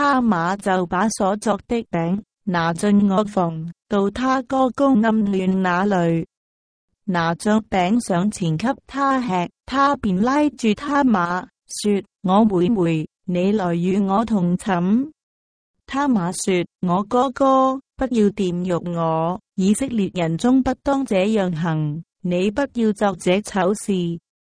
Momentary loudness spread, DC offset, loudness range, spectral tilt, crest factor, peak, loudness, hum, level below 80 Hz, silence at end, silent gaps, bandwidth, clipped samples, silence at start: 7 LU; under 0.1%; 2 LU; -6 dB/octave; 16 dB; -4 dBFS; -20 LUFS; none; -50 dBFS; 0.3 s; 6.37-6.88 s, 15.23-15.74 s, 16.75-16.79 s; 10.5 kHz; under 0.1%; 0 s